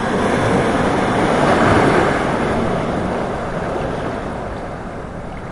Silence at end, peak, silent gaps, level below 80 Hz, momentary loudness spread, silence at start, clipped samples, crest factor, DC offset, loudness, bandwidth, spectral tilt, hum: 0 s; 0 dBFS; none; -34 dBFS; 15 LU; 0 s; under 0.1%; 16 dB; 0.2%; -17 LUFS; 11.5 kHz; -6 dB/octave; none